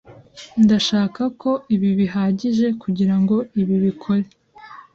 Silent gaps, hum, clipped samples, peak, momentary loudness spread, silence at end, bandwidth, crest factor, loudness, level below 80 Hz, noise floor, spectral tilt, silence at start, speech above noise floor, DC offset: none; none; under 0.1%; -6 dBFS; 7 LU; 0.15 s; 7.6 kHz; 14 dB; -19 LUFS; -56 dBFS; -42 dBFS; -7 dB/octave; 0.1 s; 24 dB; under 0.1%